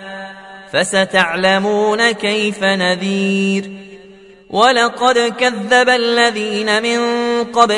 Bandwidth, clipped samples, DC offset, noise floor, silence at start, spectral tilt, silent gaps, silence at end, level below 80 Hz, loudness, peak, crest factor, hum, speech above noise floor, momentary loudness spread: 11 kHz; under 0.1%; under 0.1%; -41 dBFS; 0 s; -3.5 dB/octave; none; 0 s; -58 dBFS; -14 LUFS; 0 dBFS; 16 dB; none; 27 dB; 10 LU